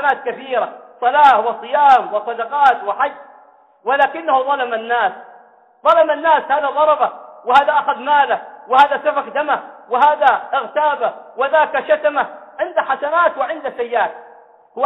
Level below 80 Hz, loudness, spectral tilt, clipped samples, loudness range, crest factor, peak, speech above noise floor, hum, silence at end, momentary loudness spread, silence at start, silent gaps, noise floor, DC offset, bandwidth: -64 dBFS; -16 LUFS; -4 dB/octave; under 0.1%; 3 LU; 16 dB; -2 dBFS; 32 dB; none; 0 s; 10 LU; 0 s; none; -48 dBFS; under 0.1%; 7.6 kHz